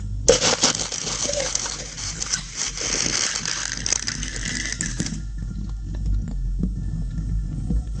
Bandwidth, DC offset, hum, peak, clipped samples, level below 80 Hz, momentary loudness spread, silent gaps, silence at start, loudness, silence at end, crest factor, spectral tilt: 10 kHz; under 0.1%; none; 0 dBFS; under 0.1%; -30 dBFS; 11 LU; none; 0 s; -24 LUFS; 0 s; 24 dB; -2.5 dB/octave